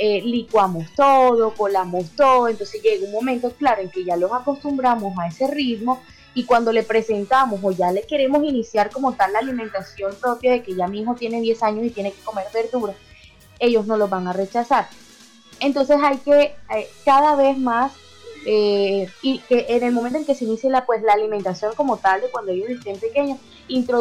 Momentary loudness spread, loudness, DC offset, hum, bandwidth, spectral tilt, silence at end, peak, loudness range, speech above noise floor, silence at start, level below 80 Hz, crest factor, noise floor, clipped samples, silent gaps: 10 LU; -20 LUFS; under 0.1%; none; 15 kHz; -5.5 dB/octave; 0 s; -6 dBFS; 5 LU; 28 dB; 0 s; -56 dBFS; 12 dB; -47 dBFS; under 0.1%; none